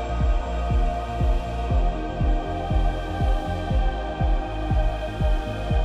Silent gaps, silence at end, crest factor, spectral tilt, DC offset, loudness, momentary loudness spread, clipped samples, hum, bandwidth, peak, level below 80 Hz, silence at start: none; 0 s; 12 dB; -7.5 dB/octave; under 0.1%; -26 LUFS; 3 LU; under 0.1%; none; 7.8 kHz; -10 dBFS; -24 dBFS; 0 s